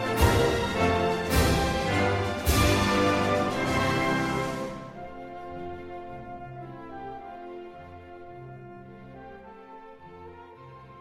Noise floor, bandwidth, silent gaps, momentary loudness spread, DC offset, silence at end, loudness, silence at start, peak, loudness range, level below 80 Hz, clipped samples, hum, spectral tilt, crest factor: -47 dBFS; 16 kHz; none; 23 LU; under 0.1%; 0 s; -25 LUFS; 0 s; -8 dBFS; 20 LU; -38 dBFS; under 0.1%; none; -5 dB/octave; 20 dB